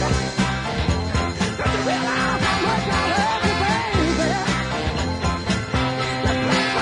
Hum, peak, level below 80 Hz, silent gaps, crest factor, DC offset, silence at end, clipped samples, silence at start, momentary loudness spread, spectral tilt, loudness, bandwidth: none; -8 dBFS; -34 dBFS; none; 14 dB; under 0.1%; 0 s; under 0.1%; 0 s; 4 LU; -4.5 dB/octave; -21 LUFS; 11 kHz